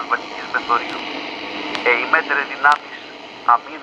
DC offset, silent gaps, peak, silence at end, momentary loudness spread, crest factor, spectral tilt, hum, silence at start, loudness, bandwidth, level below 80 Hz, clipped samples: under 0.1%; none; 0 dBFS; 0 s; 11 LU; 20 dB; -2.5 dB/octave; none; 0 s; -19 LUFS; 10.5 kHz; -64 dBFS; under 0.1%